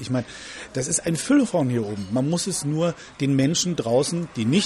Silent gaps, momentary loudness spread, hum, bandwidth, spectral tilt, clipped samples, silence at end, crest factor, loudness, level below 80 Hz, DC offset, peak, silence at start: none; 8 LU; none; 13 kHz; -5 dB/octave; under 0.1%; 0 s; 14 dB; -23 LUFS; -56 dBFS; under 0.1%; -8 dBFS; 0 s